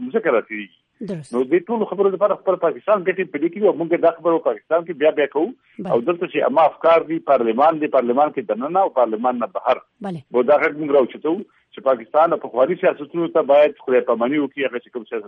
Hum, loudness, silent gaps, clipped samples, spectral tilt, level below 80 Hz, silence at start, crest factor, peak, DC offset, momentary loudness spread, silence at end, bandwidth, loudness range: none; -19 LUFS; none; under 0.1%; -7.5 dB/octave; -70 dBFS; 0 s; 14 dB; -4 dBFS; under 0.1%; 9 LU; 0 s; 9.4 kHz; 2 LU